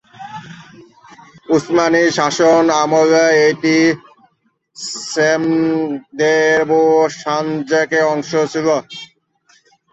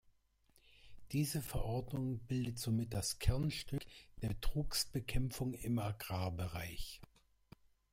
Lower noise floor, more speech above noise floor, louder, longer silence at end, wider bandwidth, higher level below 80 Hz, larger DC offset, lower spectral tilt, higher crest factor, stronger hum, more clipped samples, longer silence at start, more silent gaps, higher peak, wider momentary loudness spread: second, -61 dBFS vs -73 dBFS; first, 47 dB vs 34 dB; first, -14 LUFS vs -40 LUFS; about the same, 0.85 s vs 0.85 s; second, 8.2 kHz vs 16.5 kHz; second, -62 dBFS vs -48 dBFS; neither; about the same, -4.5 dB/octave vs -5 dB/octave; second, 14 dB vs 22 dB; neither; neither; second, 0.2 s vs 0.85 s; neither; first, -2 dBFS vs -18 dBFS; first, 14 LU vs 8 LU